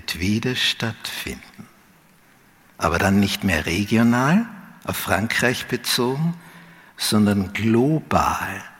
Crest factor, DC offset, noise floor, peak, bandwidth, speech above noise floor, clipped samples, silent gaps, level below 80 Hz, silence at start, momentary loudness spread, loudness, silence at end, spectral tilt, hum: 20 dB; under 0.1%; -54 dBFS; -2 dBFS; 17 kHz; 33 dB; under 0.1%; none; -46 dBFS; 0.1 s; 10 LU; -21 LUFS; 0.1 s; -4.5 dB/octave; none